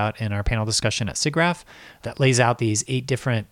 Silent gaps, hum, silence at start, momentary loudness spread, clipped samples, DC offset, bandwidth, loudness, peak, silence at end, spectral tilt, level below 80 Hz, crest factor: none; none; 0 s; 8 LU; under 0.1%; under 0.1%; 14 kHz; -22 LUFS; -6 dBFS; 0.05 s; -4.5 dB/octave; -38 dBFS; 18 dB